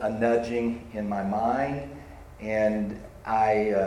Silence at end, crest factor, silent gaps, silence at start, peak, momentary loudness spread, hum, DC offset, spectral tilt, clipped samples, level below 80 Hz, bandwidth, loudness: 0 s; 14 dB; none; 0 s; -12 dBFS; 15 LU; none; under 0.1%; -7.5 dB/octave; under 0.1%; -50 dBFS; 12.5 kHz; -27 LUFS